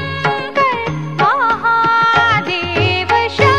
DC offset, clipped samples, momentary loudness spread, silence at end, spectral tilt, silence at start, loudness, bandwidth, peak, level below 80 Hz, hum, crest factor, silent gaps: 0.8%; under 0.1%; 6 LU; 0 s; -5.5 dB/octave; 0 s; -14 LUFS; 11.5 kHz; 0 dBFS; -38 dBFS; none; 14 dB; none